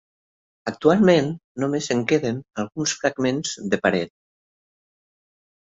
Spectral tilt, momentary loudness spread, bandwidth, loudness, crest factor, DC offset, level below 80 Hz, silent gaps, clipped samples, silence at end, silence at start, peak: -5 dB/octave; 12 LU; 8.2 kHz; -22 LUFS; 20 dB; under 0.1%; -60 dBFS; 1.44-1.55 s; under 0.1%; 1.7 s; 0.65 s; -4 dBFS